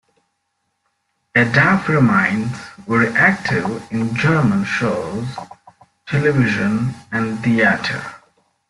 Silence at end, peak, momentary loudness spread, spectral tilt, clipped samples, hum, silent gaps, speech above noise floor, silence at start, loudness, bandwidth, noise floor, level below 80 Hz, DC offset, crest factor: 0.5 s; -2 dBFS; 12 LU; -6.5 dB/octave; under 0.1%; none; none; 54 dB; 1.35 s; -17 LUFS; 11.5 kHz; -71 dBFS; -52 dBFS; under 0.1%; 18 dB